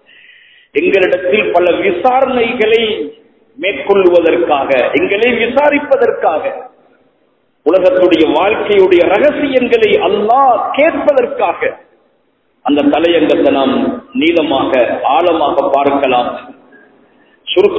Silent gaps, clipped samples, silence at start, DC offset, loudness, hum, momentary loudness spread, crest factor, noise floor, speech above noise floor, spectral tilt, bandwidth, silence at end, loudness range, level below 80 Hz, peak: none; 0.3%; 0.75 s; under 0.1%; -11 LUFS; none; 8 LU; 12 dB; -58 dBFS; 47 dB; -6.5 dB/octave; 8 kHz; 0 s; 3 LU; -48 dBFS; 0 dBFS